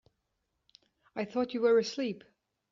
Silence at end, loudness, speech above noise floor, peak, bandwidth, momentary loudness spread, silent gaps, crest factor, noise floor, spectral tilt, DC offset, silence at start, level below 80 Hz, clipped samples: 0.55 s; -31 LUFS; 52 dB; -16 dBFS; 7.4 kHz; 16 LU; none; 18 dB; -82 dBFS; -4 dB/octave; under 0.1%; 1.15 s; -76 dBFS; under 0.1%